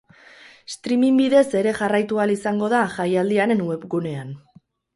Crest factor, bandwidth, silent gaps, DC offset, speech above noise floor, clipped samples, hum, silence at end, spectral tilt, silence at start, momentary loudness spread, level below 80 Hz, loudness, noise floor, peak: 16 dB; 11.5 kHz; none; under 0.1%; 28 dB; under 0.1%; none; 0.6 s; -6 dB/octave; 0.7 s; 16 LU; -64 dBFS; -20 LUFS; -48 dBFS; -4 dBFS